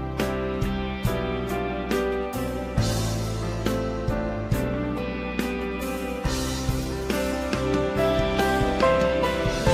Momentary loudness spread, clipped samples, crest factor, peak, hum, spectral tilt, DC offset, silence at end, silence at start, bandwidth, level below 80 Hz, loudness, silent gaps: 6 LU; under 0.1%; 16 dB; -8 dBFS; none; -5.5 dB/octave; under 0.1%; 0 s; 0 s; 16 kHz; -34 dBFS; -26 LUFS; none